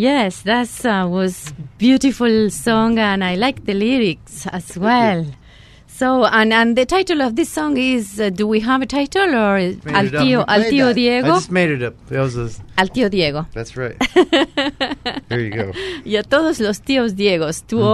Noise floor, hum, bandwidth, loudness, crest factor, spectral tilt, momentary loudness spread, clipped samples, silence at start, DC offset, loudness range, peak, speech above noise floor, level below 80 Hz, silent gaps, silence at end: -44 dBFS; none; 13.5 kHz; -17 LUFS; 16 dB; -5 dB/octave; 9 LU; under 0.1%; 0 s; under 0.1%; 3 LU; 0 dBFS; 27 dB; -44 dBFS; none; 0 s